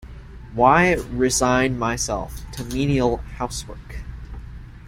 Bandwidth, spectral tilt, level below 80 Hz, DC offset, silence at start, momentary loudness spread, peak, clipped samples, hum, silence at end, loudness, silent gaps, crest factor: 16.5 kHz; -4.5 dB/octave; -36 dBFS; under 0.1%; 0 s; 21 LU; -2 dBFS; under 0.1%; none; 0 s; -20 LUFS; none; 20 dB